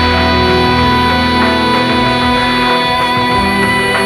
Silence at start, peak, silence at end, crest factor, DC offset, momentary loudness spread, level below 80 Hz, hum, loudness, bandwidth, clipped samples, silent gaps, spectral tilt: 0 s; 0 dBFS; 0 s; 10 dB; under 0.1%; 1 LU; -28 dBFS; none; -11 LUFS; 16.5 kHz; under 0.1%; none; -5 dB/octave